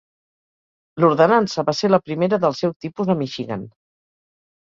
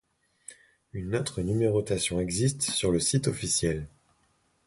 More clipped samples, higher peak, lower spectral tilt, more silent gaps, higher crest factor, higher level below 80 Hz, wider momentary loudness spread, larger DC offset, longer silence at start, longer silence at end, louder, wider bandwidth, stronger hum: neither; first, -2 dBFS vs -12 dBFS; first, -6.5 dB/octave vs -4.5 dB/octave; first, 2.76-2.80 s vs none; about the same, 18 dB vs 16 dB; second, -62 dBFS vs -48 dBFS; second, 13 LU vs 21 LU; neither; first, 0.95 s vs 0.5 s; first, 1 s vs 0.8 s; first, -19 LUFS vs -27 LUFS; second, 7.6 kHz vs 11.5 kHz; neither